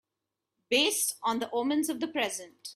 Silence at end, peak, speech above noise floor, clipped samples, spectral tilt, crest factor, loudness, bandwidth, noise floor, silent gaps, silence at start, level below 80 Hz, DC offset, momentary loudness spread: 0 s; -12 dBFS; 57 dB; under 0.1%; -1 dB/octave; 20 dB; -29 LUFS; 15.5 kHz; -87 dBFS; none; 0.7 s; -76 dBFS; under 0.1%; 7 LU